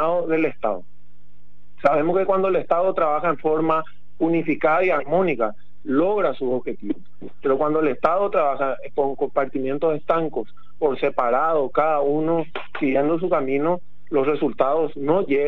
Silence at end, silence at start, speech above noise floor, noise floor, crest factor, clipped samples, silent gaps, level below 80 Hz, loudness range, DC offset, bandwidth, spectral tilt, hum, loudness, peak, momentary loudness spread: 0 s; 0 s; 37 dB; -58 dBFS; 18 dB; under 0.1%; none; -54 dBFS; 2 LU; 4%; 6 kHz; -9 dB/octave; none; -22 LUFS; -4 dBFS; 7 LU